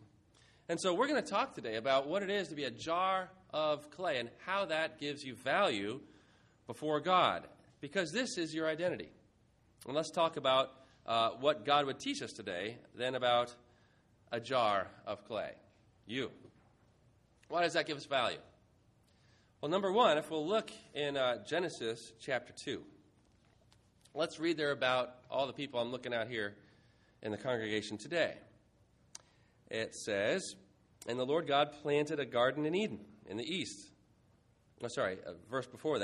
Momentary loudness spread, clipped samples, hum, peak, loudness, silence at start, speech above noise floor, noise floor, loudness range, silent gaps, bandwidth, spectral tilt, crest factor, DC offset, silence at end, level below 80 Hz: 13 LU; under 0.1%; none; -14 dBFS; -36 LUFS; 0 s; 34 dB; -69 dBFS; 5 LU; none; 11.5 kHz; -4 dB/octave; 22 dB; under 0.1%; 0 s; -76 dBFS